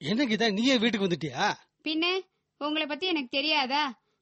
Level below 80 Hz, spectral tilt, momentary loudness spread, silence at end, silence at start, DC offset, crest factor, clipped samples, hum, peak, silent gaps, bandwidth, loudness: -70 dBFS; -4 dB/octave; 9 LU; 0.3 s; 0 s; under 0.1%; 16 dB; under 0.1%; none; -12 dBFS; none; 8.4 kHz; -27 LUFS